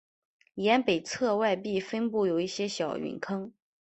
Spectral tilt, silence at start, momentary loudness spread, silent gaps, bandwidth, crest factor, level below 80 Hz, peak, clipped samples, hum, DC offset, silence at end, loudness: -4.5 dB/octave; 0.55 s; 10 LU; none; 8.4 kHz; 20 dB; -70 dBFS; -10 dBFS; under 0.1%; none; under 0.1%; 0.3 s; -29 LUFS